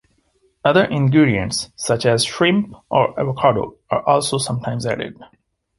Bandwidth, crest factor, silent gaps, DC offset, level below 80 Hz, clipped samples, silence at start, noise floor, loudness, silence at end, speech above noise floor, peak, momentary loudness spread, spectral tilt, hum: 11.5 kHz; 18 dB; none; under 0.1%; -48 dBFS; under 0.1%; 0.65 s; -62 dBFS; -18 LUFS; 0.55 s; 44 dB; 0 dBFS; 8 LU; -5 dB/octave; none